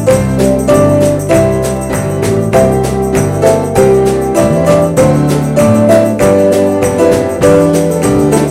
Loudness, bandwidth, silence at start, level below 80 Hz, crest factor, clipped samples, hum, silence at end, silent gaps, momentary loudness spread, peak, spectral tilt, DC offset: -9 LUFS; 16.5 kHz; 0 s; -30 dBFS; 8 dB; under 0.1%; none; 0 s; none; 4 LU; 0 dBFS; -6.5 dB/octave; under 0.1%